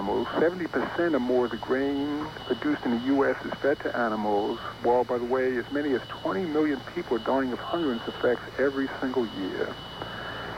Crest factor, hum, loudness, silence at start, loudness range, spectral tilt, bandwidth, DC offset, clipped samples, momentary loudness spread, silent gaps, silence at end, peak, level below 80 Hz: 16 dB; none; -28 LUFS; 0 s; 2 LU; -6.5 dB/octave; 16 kHz; under 0.1%; under 0.1%; 7 LU; none; 0 s; -12 dBFS; -56 dBFS